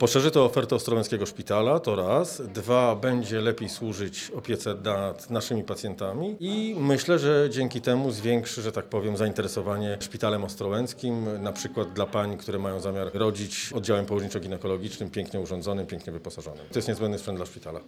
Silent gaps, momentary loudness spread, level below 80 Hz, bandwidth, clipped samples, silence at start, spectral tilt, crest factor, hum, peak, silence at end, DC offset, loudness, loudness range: none; 10 LU; -60 dBFS; 16 kHz; under 0.1%; 0 s; -5.5 dB/octave; 22 dB; none; -6 dBFS; 0 s; under 0.1%; -28 LUFS; 5 LU